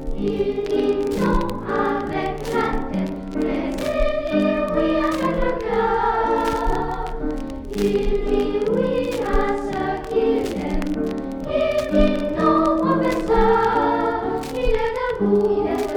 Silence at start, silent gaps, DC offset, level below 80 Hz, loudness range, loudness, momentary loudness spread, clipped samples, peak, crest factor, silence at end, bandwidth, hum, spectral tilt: 0 s; none; under 0.1%; -30 dBFS; 3 LU; -21 LUFS; 7 LU; under 0.1%; -4 dBFS; 16 dB; 0 s; 18.5 kHz; none; -6.5 dB/octave